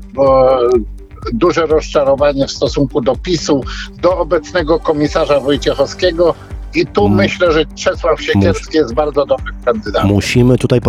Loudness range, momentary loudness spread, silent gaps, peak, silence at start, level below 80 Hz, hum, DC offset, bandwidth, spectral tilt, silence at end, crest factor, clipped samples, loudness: 1 LU; 6 LU; none; 0 dBFS; 0 s; -28 dBFS; none; under 0.1%; 13 kHz; -6 dB/octave; 0 s; 12 dB; under 0.1%; -13 LUFS